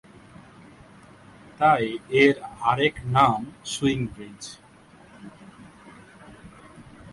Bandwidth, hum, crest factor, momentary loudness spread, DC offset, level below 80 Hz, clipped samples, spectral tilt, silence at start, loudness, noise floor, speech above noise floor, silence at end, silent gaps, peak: 11.5 kHz; none; 24 dB; 23 LU; under 0.1%; -54 dBFS; under 0.1%; -5 dB/octave; 1.6 s; -22 LUFS; -51 dBFS; 29 dB; 0.05 s; none; -2 dBFS